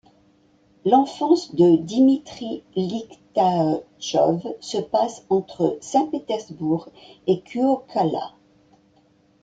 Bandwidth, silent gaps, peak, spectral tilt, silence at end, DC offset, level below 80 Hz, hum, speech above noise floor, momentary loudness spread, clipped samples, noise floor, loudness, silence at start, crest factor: 9.2 kHz; none; -4 dBFS; -6.5 dB/octave; 1.15 s; under 0.1%; -64 dBFS; none; 38 dB; 11 LU; under 0.1%; -59 dBFS; -22 LUFS; 0.85 s; 18 dB